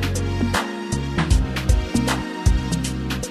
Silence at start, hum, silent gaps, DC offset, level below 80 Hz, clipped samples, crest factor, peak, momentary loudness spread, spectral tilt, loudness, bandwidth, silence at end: 0 s; none; none; under 0.1%; -24 dBFS; under 0.1%; 16 dB; -4 dBFS; 5 LU; -5 dB/octave; -22 LUFS; 14 kHz; 0 s